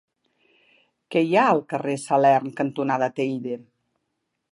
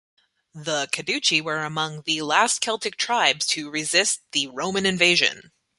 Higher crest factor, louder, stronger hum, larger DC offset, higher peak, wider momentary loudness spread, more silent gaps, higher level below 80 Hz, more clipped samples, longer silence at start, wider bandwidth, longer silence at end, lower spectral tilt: about the same, 18 dB vs 22 dB; about the same, -22 LUFS vs -21 LUFS; neither; neither; second, -6 dBFS vs -2 dBFS; about the same, 10 LU vs 9 LU; neither; second, -78 dBFS vs -66 dBFS; neither; first, 1.1 s vs 0.55 s; about the same, 11.5 kHz vs 12 kHz; first, 0.95 s vs 0.4 s; first, -6 dB/octave vs -1.5 dB/octave